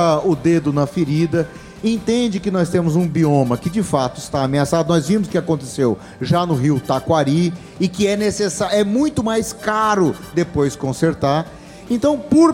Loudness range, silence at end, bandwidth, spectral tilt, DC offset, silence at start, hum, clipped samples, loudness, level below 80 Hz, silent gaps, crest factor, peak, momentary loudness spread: 1 LU; 0 s; 16.5 kHz; -6 dB/octave; under 0.1%; 0 s; none; under 0.1%; -18 LUFS; -46 dBFS; none; 16 dB; 0 dBFS; 6 LU